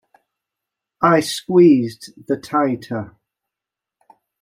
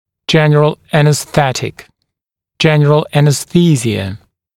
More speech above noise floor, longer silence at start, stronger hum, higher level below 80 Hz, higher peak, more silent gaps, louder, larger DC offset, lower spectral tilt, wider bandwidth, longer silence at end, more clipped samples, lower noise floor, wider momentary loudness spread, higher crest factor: about the same, 70 dB vs 68 dB; first, 1 s vs 0.3 s; neither; second, -64 dBFS vs -48 dBFS; about the same, -2 dBFS vs 0 dBFS; neither; second, -17 LUFS vs -12 LUFS; neither; about the same, -6 dB/octave vs -5.5 dB/octave; about the same, 15.5 kHz vs 14.5 kHz; first, 1.35 s vs 0.4 s; neither; first, -86 dBFS vs -80 dBFS; first, 16 LU vs 11 LU; about the same, 18 dB vs 14 dB